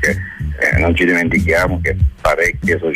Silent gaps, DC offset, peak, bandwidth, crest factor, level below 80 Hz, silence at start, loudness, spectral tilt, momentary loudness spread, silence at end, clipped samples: none; under 0.1%; -4 dBFS; 15.5 kHz; 12 dB; -24 dBFS; 0 s; -15 LUFS; -6 dB/octave; 4 LU; 0 s; under 0.1%